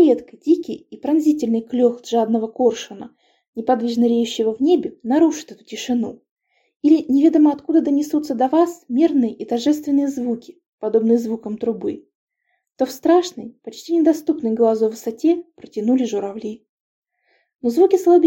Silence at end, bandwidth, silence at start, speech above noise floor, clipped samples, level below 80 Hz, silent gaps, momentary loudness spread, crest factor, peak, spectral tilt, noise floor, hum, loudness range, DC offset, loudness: 0 s; 17 kHz; 0 s; 54 dB; under 0.1%; -66 dBFS; 3.48-3.53 s, 6.31-6.36 s, 6.76-6.80 s, 10.68-10.78 s, 12.15-12.27 s, 16.69-17.02 s; 14 LU; 16 dB; -4 dBFS; -5.5 dB/octave; -72 dBFS; none; 4 LU; under 0.1%; -19 LUFS